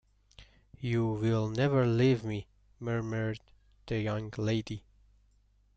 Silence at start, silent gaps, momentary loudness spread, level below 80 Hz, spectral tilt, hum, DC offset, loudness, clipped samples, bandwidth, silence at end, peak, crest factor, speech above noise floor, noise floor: 0.4 s; none; 14 LU; -58 dBFS; -7.5 dB/octave; 50 Hz at -60 dBFS; under 0.1%; -31 LUFS; under 0.1%; 7.8 kHz; 1 s; -16 dBFS; 16 dB; 37 dB; -67 dBFS